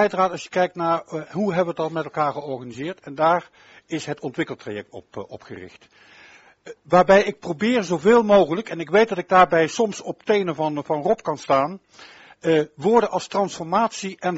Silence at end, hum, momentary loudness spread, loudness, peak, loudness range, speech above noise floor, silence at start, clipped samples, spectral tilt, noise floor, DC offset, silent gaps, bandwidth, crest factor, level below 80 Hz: 0 s; none; 16 LU; -21 LUFS; 0 dBFS; 9 LU; 28 dB; 0 s; under 0.1%; -4 dB/octave; -50 dBFS; under 0.1%; none; 8 kHz; 22 dB; -58 dBFS